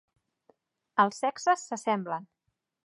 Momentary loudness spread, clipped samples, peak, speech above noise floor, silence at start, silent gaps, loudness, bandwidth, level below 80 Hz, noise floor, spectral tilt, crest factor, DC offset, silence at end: 8 LU; under 0.1%; -10 dBFS; 40 dB; 0.95 s; none; -29 LUFS; 11.5 kHz; -86 dBFS; -68 dBFS; -4 dB/octave; 22 dB; under 0.1%; 0.65 s